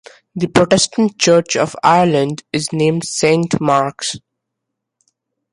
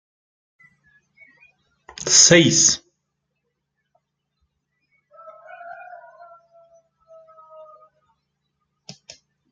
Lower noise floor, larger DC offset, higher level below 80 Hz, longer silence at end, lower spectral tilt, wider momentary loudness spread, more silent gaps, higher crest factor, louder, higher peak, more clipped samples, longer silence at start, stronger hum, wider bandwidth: about the same, -78 dBFS vs -77 dBFS; neither; first, -52 dBFS vs -62 dBFS; second, 1.35 s vs 3.8 s; first, -4.5 dB/octave vs -2 dB/octave; second, 11 LU vs 29 LU; neither; second, 16 dB vs 24 dB; about the same, -15 LUFS vs -13 LUFS; about the same, 0 dBFS vs 0 dBFS; neither; second, 0.35 s vs 2 s; neither; about the same, 11.5 kHz vs 10.5 kHz